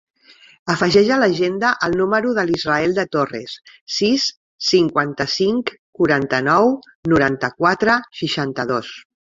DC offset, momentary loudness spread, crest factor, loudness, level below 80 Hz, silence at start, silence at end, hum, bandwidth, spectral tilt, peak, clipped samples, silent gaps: under 0.1%; 9 LU; 18 dB; -18 LUFS; -52 dBFS; 0.65 s; 0.2 s; none; 7.8 kHz; -5 dB/octave; -2 dBFS; under 0.1%; 3.81-3.87 s, 4.37-4.58 s, 5.79-5.93 s, 6.95-7.03 s